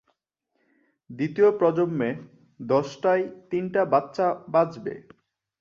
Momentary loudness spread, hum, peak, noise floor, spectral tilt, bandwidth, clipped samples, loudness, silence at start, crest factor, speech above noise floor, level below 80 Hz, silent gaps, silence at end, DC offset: 15 LU; none; -8 dBFS; -76 dBFS; -7.5 dB/octave; 7.4 kHz; under 0.1%; -24 LUFS; 1.1 s; 18 dB; 52 dB; -70 dBFS; none; 0.6 s; under 0.1%